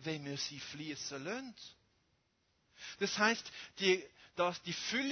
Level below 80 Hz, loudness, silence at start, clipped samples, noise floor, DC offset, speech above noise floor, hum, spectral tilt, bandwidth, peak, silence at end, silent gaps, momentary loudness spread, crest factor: -78 dBFS; -37 LUFS; 0 s; under 0.1%; -78 dBFS; under 0.1%; 40 dB; none; -3 dB/octave; 6.6 kHz; -16 dBFS; 0 s; none; 18 LU; 24 dB